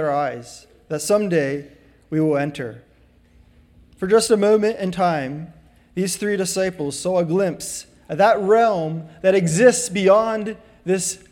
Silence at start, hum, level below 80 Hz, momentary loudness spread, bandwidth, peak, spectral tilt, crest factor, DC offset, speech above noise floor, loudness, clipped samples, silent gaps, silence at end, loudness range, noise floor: 0 s; none; -56 dBFS; 16 LU; 18.5 kHz; -2 dBFS; -4.5 dB/octave; 18 dB; under 0.1%; 34 dB; -19 LUFS; under 0.1%; none; 0.15 s; 6 LU; -53 dBFS